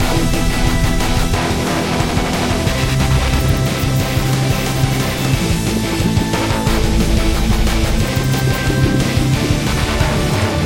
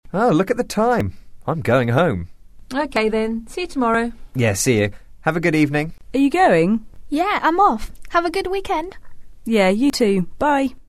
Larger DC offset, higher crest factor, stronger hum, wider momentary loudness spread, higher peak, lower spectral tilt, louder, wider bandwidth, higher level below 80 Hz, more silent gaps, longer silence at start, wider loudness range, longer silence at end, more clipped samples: neither; about the same, 14 dB vs 16 dB; neither; second, 2 LU vs 11 LU; first, 0 dBFS vs -4 dBFS; about the same, -5 dB/octave vs -5.5 dB/octave; first, -16 LUFS vs -19 LUFS; first, 17 kHz vs 13.5 kHz; first, -20 dBFS vs -40 dBFS; neither; about the same, 0 s vs 0.05 s; about the same, 1 LU vs 3 LU; about the same, 0 s vs 0.05 s; neither